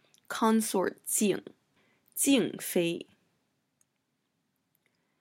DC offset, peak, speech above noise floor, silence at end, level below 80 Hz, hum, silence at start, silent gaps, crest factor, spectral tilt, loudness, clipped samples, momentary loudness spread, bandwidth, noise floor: under 0.1%; -12 dBFS; 51 dB; 2.2 s; -80 dBFS; none; 0.3 s; none; 20 dB; -3.5 dB/octave; -29 LUFS; under 0.1%; 12 LU; 16.5 kHz; -79 dBFS